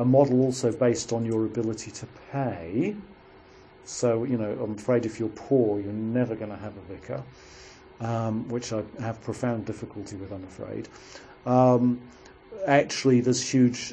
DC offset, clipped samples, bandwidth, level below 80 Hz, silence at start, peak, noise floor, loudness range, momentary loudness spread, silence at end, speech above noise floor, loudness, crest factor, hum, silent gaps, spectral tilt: under 0.1%; under 0.1%; 10.5 kHz; -60 dBFS; 0 s; -6 dBFS; -51 dBFS; 8 LU; 18 LU; 0 s; 25 dB; -26 LUFS; 20 dB; none; none; -6 dB/octave